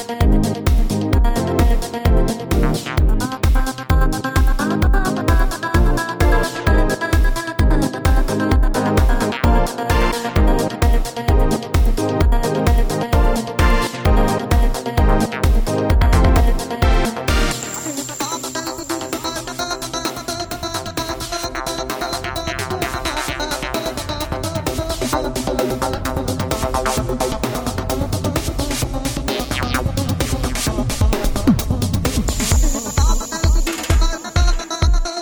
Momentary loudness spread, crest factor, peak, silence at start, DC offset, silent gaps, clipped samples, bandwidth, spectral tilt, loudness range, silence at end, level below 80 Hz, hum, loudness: 6 LU; 14 dB; -2 dBFS; 0 s; under 0.1%; none; under 0.1%; over 20 kHz; -5 dB/octave; 5 LU; 0 s; -20 dBFS; none; -19 LUFS